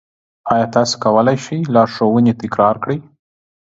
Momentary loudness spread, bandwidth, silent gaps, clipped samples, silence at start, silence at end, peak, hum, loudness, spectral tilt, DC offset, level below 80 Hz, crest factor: 8 LU; 8 kHz; none; under 0.1%; 0.45 s; 0.6 s; 0 dBFS; none; -15 LUFS; -6 dB/octave; under 0.1%; -54 dBFS; 16 dB